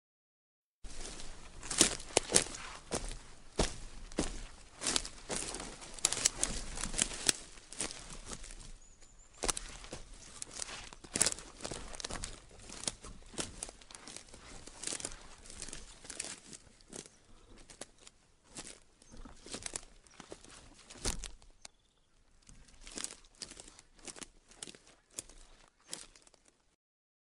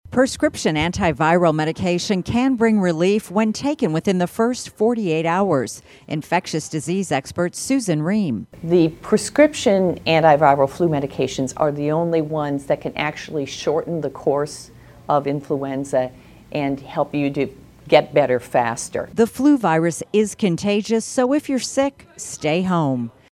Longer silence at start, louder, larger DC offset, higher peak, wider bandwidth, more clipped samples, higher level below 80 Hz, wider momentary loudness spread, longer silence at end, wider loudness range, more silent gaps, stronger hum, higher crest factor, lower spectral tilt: first, 0.85 s vs 0.1 s; second, -37 LUFS vs -20 LUFS; neither; second, -4 dBFS vs 0 dBFS; second, 11.5 kHz vs 15.5 kHz; neither; about the same, -52 dBFS vs -50 dBFS; first, 23 LU vs 9 LU; first, 1.05 s vs 0.2 s; first, 15 LU vs 6 LU; neither; neither; first, 36 dB vs 20 dB; second, -1.5 dB/octave vs -5.5 dB/octave